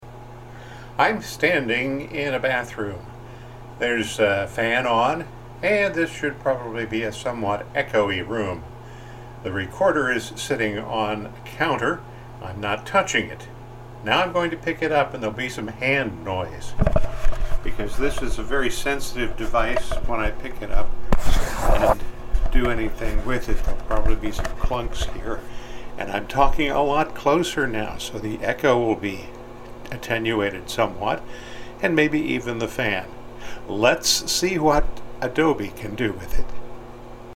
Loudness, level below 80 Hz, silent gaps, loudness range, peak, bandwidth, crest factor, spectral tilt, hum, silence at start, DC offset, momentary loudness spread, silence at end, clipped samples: -24 LUFS; -30 dBFS; none; 4 LU; -4 dBFS; 15.5 kHz; 18 dB; -4.5 dB/octave; none; 0 s; under 0.1%; 18 LU; 0 s; under 0.1%